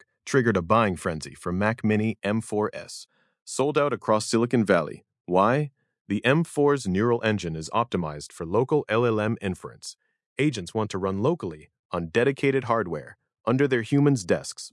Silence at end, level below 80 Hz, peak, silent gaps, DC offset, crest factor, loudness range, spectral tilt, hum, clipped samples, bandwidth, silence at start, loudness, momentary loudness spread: 0.05 s; -62 dBFS; -6 dBFS; 3.42-3.46 s, 5.21-5.25 s, 6.01-6.05 s, 10.26-10.36 s, 11.79-11.89 s; under 0.1%; 20 dB; 3 LU; -6 dB/octave; none; under 0.1%; 12 kHz; 0.25 s; -25 LUFS; 13 LU